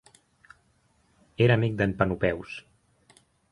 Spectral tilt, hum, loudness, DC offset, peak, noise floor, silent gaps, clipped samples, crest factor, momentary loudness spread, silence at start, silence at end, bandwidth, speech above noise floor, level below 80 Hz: -8 dB/octave; none; -25 LUFS; under 0.1%; -6 dBFS; -67 dBFS; none; under 0.1%; 24 dB; 19 LU; 1.4 s; 0.9 s; 11.5 kHz; 42 dB; -52 dBFS